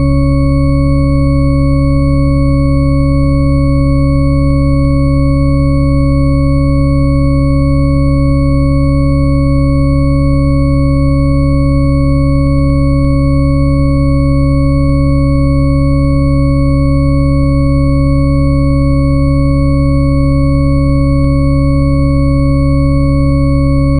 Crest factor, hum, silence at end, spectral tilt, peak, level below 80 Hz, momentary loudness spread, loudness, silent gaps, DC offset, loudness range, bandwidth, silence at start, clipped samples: 8 dB; none; 0 s; -9.5 dB/octave; 0 dBFS; -14 dBFS; 0 LU; -11 LUFS; none; under 0.1%; 0 LU; 9.4 kHz; 0 s; under 0.1%